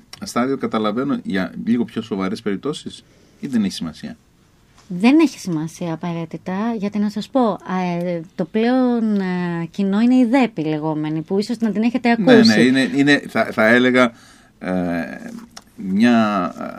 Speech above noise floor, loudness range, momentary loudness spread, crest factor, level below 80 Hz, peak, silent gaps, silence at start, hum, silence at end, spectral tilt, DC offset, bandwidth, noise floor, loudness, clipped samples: 36 dB; 8 LU; 13 LU; 18 dB; -58 dBFS; 0 dBFS; none; 0.2 s; none; 0 s; -6 dB/octave; under 0.1%; 12.5 kHz; -54 dBFS; -18 LUFS; under 0.1%